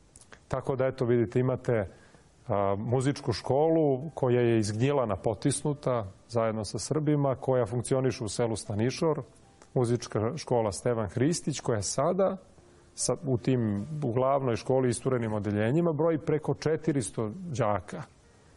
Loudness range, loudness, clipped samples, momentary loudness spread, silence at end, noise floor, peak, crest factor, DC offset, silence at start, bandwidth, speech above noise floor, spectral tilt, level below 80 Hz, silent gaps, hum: 2 LU; -29 LUFS; under 0.1%; 7 LU; 0.5 s; -55 dBFS; -12 dBFS; 16 dB; under 0.1%; 0.15 s; 11.5 kHz; 27 dB; -6 dB/octave; -58 dBFS; none; none